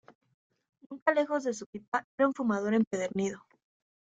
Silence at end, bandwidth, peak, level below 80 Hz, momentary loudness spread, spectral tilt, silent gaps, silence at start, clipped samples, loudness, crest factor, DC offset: 0.7 s; 9 kHz; -10 dBFS; -74 dBFS; 9 LU; -5.5 dB/octave; 1.02-1.06 s, 1.66-1.73 s, 1.88-1.92 s, 2.04-2.18 s, 2.87-2.91 s; 0.9 s; under 0.1%; -31 LUFS; 22 dB; under 0.1%